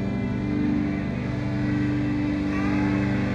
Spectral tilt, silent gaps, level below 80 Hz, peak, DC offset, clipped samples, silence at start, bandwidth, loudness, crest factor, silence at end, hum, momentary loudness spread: -8 dB/octave; none; -40 dBFS; -12 dBFS; under 0.1%; under 0.1%; 0 s; 7.8 kHz; -25 LUFS; 12 dB; 0 s; 50 Hz at -45 dBFS; 4 LU